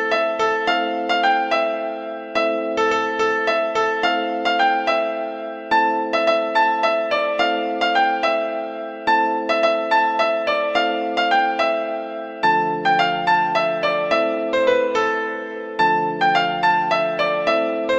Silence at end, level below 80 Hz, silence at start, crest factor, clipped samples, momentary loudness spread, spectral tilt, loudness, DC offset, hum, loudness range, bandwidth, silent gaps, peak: 0 s; -62 dBFS; 0 s; 14 dB; under 0.1%; 6 LU; -4 dB/octave; -19 LUFS; under 0.1%; none; 1 LU; 8.8 kHz; none; -6 dBFS